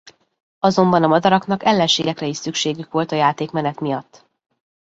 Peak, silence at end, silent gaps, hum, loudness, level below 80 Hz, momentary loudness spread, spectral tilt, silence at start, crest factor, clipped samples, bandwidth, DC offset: -2 dBFS; 0.95 s; none; none; -18 LUFS; -60 dBFS; 9 LU; -5 dB/octave; 0.65 s; 18 dB; under 0.1%; 8 kHz; under 0.1%